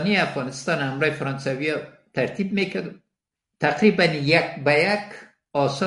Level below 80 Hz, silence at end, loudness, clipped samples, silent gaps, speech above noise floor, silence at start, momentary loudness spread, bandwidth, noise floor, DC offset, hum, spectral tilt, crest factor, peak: -64 dBFS; 0 s; -22 LUFS; under 0.1%; none; 61 dB; 0 s; 11 LU; 11.5 kHz; -83 dBFS; under 0.1%; none; -5.5 dB/octave; 22 dB; 0 dBFS